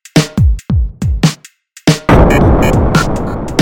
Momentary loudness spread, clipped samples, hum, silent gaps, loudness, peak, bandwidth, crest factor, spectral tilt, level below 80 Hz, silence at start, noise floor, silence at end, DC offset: 8 LU; 0.2%; none; none; -12 LUFS; 0 dBFS; 17 kHz; 10 dB; -6 dB/octave; -16 dBFS; 0.15 s; -41 dBFS; 0 s; under 0.1%